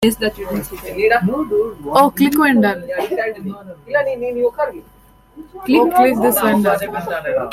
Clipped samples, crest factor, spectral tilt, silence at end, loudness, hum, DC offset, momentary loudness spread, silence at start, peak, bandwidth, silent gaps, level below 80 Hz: under 0.1%; 16 dB; -5 dB/octave; 0 s; -16 LUFS; none; under 0.1%; 12 LU; 0 s; -2 dBFS; 16.5 kHz; none; -46 dBFS